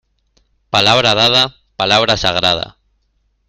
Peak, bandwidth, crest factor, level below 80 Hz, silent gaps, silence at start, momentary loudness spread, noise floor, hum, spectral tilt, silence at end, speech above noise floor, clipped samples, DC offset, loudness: 0 dBFS; 16 kHz; 16 dB; -44 dBFS; none; 0.75 s; 9 LU; -62 dBFS; none; -3 dB/octave; 0.8 s; 49 dB; under 0.1%; under 0.1%; -12 LUFS